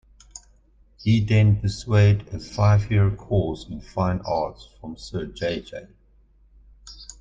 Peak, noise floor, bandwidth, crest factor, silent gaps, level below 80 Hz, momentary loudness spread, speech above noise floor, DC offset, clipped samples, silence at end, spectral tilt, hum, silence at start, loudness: -6 dBFS; -56 dBFS; 7.6 kHz; 18 dB; none; -42 dBFS; 22 LU; 35 dB; under 0.1%; under 0.1%; 0.15 s; -7 dB/octave; none; 0.35 s; -23 LUFS